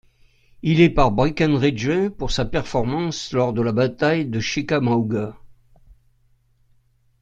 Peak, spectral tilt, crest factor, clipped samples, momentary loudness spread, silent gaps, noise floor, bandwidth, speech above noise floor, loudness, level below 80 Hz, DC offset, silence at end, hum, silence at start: -2 dBFS; -6.5 dB/octave; 18 dB; under 0.1%; 8 LU; none; -60 dBFS; 8.8 kHz; 41 dB; -20 LUFS; -38 dBFS; under 0.1%; 1.7 s; none; 0.65 s